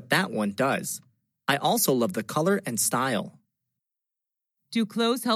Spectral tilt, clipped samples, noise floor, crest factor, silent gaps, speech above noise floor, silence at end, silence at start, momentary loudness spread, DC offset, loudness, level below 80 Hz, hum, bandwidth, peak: -3.5 dB/octave; under 0.1%; -87 dBFS; 20 dB; none; 62 dB; 0 s; 0 s; 10 LU; under 0.1%; -26 LUFS; -82 dBFS; none; 16 kHz; -8 dBFS